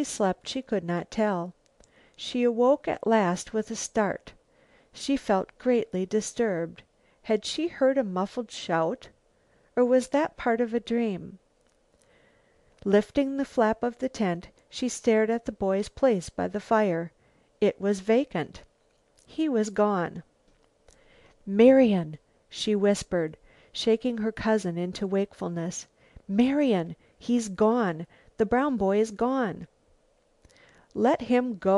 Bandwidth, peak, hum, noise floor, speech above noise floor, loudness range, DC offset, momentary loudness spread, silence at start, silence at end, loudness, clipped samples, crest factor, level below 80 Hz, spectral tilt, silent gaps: 11.5 kHz; -6 dBFS; none; -66 dBFS; 41 dB; 4 LU; under 0.1%; 13 LU; 0 s; 0 s; -26 LUFS; under 0.1%; 20 dB; -58 dBFS; -5.5 dB/octave; none